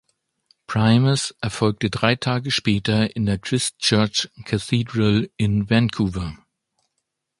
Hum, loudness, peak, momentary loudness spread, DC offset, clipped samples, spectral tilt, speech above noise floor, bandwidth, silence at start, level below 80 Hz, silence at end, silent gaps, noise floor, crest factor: none; -21 LUFS; 0 dBFS; 7 LU; under 0.1%; under 0.1%; -5 dB/octave; 57 dB; 11.5 kHz; 0.7 s; -46 dBFS; 1.05 s; none; -77 dBFS; 22 dB